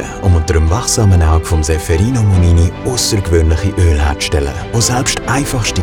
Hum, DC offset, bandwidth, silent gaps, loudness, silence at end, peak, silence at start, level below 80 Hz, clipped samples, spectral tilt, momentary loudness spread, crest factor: none; under 0.1%; 16 kHz; none; -13 LUFS; 0 s; 0 dBFS; 0 s; -22 dBFS; under 0.1%; -5 dB/octave; 5 LU; 12 dB